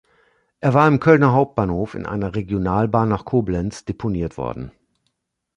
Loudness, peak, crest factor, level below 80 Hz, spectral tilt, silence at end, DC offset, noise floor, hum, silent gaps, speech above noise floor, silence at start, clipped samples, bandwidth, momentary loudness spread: -19 LUFS; -2 dBFS; 18 dB; -42 dBFS; -8.5 dB/octave; 0.9 s; under 0.1%; -73 dBFS; none; none; 54 dB; 0.6 s; under 0.1%; 10.5 kHz; 13 LU